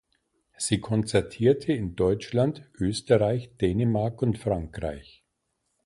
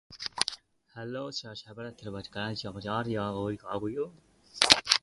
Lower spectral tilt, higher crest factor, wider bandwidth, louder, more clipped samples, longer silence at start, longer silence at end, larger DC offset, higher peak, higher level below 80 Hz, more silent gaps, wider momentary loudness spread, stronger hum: first, -6 dB/octave vs -2.5 dB/octave; second, 20 dB vs 32 dB; about the same, 11.5 kHz vs 11.5 kHz; first, -26 LUFS vs -30 LUFS; neither; first, 0.6 s vs 0.1 s; first, 0.85 s vs 0.05 s; neither; second, -8 dBFS vs 0 dBFS; first, -48 dBFS vs -62 dBFS; neither; second, 8 LU vs 20 LU; neither